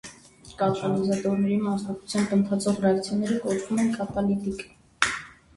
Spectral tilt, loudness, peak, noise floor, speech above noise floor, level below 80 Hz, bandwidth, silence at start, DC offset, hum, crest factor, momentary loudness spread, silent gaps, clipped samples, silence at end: -5.5 dB/octave; -26 LUFS; 0 dBFS; -49 dBFS; 24 dB; -56 dBFS; 11.5 kHz; 0.05 s; under 0.1%; none; 24 dB; 7 LU; none; under 0.1%; 0.25 s